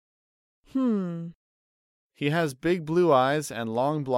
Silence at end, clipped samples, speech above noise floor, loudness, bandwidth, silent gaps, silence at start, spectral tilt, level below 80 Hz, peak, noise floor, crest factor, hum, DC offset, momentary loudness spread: 0 s; under 0.1%; over 65 dB; -26 LUFS; 16 kHz; 1.35-2.10 s; 0.75 s; -6 dB/octave; -64 dBFS; -8 dBFS; under -90 dBFS; 18 dB; none; under 0.1%; 12 LU